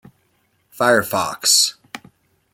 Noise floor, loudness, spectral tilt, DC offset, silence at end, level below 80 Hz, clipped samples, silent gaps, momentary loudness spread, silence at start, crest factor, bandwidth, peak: -64 dBFS; -16 LUFS; -1 dB/octave; under 0.1%; 0.55 s; -62 dBFS; under 0.1%; none; 24 LU; 0.8 s; 20 dB; 17 kHz; -2 dBFS